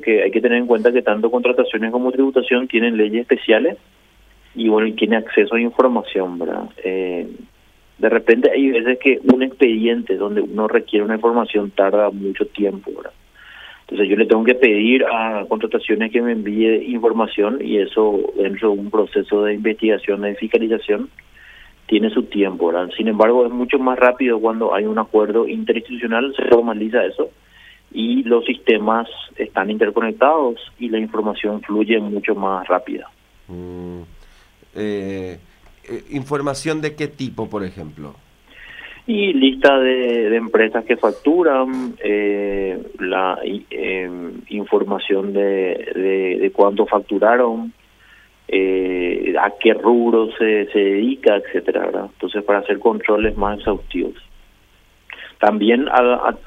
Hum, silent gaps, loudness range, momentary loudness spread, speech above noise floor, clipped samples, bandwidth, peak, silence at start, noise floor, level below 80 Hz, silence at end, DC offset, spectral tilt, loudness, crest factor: none; none; 6 LU; 13 LU; 36 dB; under 0.1%; 10.5 kHz; 0 dBFS; 0 s; -53 dBFS; -46 dBFS; 0 s; under 0.1%; -6 dB/octave; -17 LUFS; 18 dB